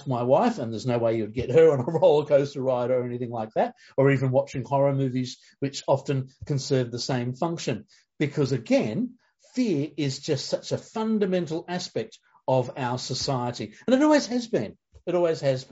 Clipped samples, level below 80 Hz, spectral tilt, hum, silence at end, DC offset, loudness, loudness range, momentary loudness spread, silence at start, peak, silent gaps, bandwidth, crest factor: under 0.1%; -62 dBFS; -6 dB/octave; none; 0.05 s; under 0.1%; -25 LUFS; 5 LU; 11 LU; 0 s; -8 dBFS; none; 8 kHz; 18 dB